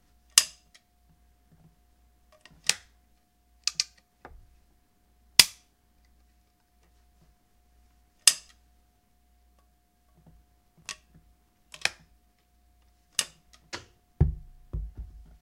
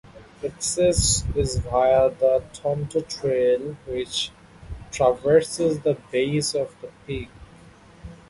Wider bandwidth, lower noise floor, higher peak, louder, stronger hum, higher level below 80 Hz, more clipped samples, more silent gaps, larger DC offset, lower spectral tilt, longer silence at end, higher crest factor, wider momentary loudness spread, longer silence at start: first, 16 kHz vs 11.5 kHz; first, -67 dBFS vs -49 dBFS; first, 0 dBFS vs -6 dBFS; second, -26 LUFS vs -23 LUFS; neither; second, -46 dBFS vs -40 dBFS; neither; neither; neither; second, -0.5 dB/octave vs -4 dB/octave; first, 0.35 s vs 0.15 s; first, 34 dB vs 18 dB; first, 24 LU vs 14 LU; first, 0.35 s vs 0.15 s